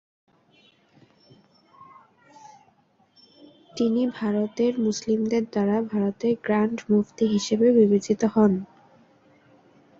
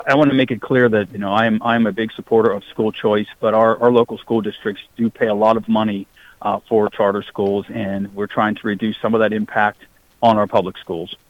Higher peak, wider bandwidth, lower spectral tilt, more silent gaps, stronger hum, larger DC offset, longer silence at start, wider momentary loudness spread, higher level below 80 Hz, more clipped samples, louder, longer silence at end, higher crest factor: second, -6 dBFS vs -2 dBFS; about the same, 7.6 kHz vs 8 kHz; about the same, -6.5 dB/octave vs -7.5 dB/octave; neither; neither; neither; first, 1.8 s vs 0 s; second, 7 LU vs 10 LU; second, -66 dBFS vs -56 dBFS; neither; second, -23 LUFS vs -18 LUFS; first, 1.35 s vs 0.15 s; about the same, 18 dB vs 16 dB